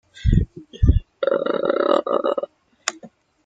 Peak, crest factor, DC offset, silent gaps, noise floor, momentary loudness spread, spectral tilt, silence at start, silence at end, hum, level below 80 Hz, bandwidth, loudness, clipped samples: 0 dBFS; 22 dB; under 0.1%; none; -47 dBFS; 9 LU; -6.5 dB/octave; 0.15 s; 0.4 s; none; -28 dBFS; 9.4 kHz; -22 LUFS; under 0.1%